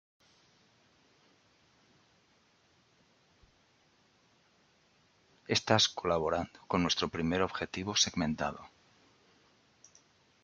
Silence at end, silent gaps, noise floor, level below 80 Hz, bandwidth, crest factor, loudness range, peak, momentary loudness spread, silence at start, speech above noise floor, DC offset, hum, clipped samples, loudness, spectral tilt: 1.75 s; none; -69 dBFS; -66 dBFS; 10 kHz; 28 dB; 4 LU; -10 dBFS; 10 LU; 5.5 s; 37 dB; under 0.1%; none; under 0.1%; -31 LUFS; -3.5 dB/octave